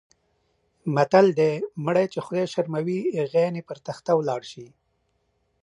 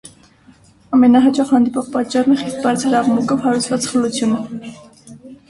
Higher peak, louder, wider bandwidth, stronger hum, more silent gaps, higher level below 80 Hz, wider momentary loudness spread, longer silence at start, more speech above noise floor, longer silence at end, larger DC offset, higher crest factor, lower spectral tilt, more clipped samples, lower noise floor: about the same, -2 dBFS vs -2 dBFS; second, -24 LUFS vs -16 LUFS; about the same, 11 kHz vs 11.5 kHz; neither; neither; second, -72 dBFS vs -56 dBFS; first, 16 LU vs 9 LU; about the same, 0.85 s vs 0.9 s; first, 48 dB vs 33 dB; first, 1 s vs 0.15 s; neither; first, 22 dB vs 14 dB; first, -7 dB/octave vs -4.5 dB/octave; neither; first, -71 dBFS vs -48 dBFS